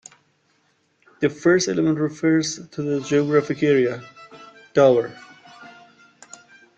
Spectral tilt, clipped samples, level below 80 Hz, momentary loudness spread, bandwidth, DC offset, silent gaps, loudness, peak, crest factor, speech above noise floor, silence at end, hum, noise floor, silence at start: -5.5 dB/octave; under 0.1%; -64 dBFS; 11 LU; 9 kHz; under 0.1%; none; -20 LUFS; -4 dBFS; 20 dB; 46 dB; 1.1 s; none; -65 dBFS; 1.2 s